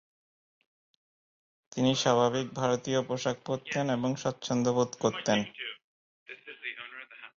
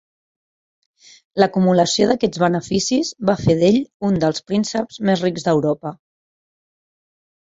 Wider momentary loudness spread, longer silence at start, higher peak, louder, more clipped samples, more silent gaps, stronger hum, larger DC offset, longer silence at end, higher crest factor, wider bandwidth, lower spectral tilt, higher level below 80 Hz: first, 17 LU vs 7 LU; first, 1.75 s vs 1.35 s; second, -12 dBFS vs 0 dBFS; second, -30 LUFS vs -18 LUFS; neither; first, 5.84-6.26 s vs 3.94-4.00 s; neither; neither; second, 0.1 s vs 1.6 s; about the same, 20 dB vs 20 dB; about the same, 7.8 kHz vs 8 kHz; about the same, -4.5 dB/octave vs -5.5 dB/octave; second, -68 dBFS vs -50 dBFS